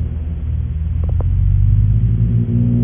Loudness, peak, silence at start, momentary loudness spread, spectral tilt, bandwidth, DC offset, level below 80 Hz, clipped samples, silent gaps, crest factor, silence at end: -17 LUFS; -2 dBFS; 0 s; 8 LU; -13.5 dB/octave; 3.3 kHz; under 0.1%; -18 dBFS; under 0.1%; none; 12 dB; 0 s